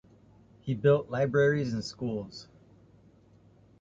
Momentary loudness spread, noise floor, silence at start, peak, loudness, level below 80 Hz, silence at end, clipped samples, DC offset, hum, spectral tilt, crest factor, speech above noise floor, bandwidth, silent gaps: 17 LU; -59 dBFS; 0.65 s; -12 dBFS; -28 LUFS; -62 dBFS; 1.4 s; under 0.1%; under 0.1%; none; -7 dB/octave; 20 dB; 32 dB; 7.8 kHz; none